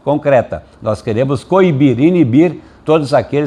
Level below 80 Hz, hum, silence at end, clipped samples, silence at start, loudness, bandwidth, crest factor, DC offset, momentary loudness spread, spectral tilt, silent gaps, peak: -46 dBFS; none; 0 s; under 0.1%; 0.05 s; -13 LUFS; 10.5 kHz; 12 dB; under 0.1%; 10 LU; -8 dB/octave; none; 0 dBFS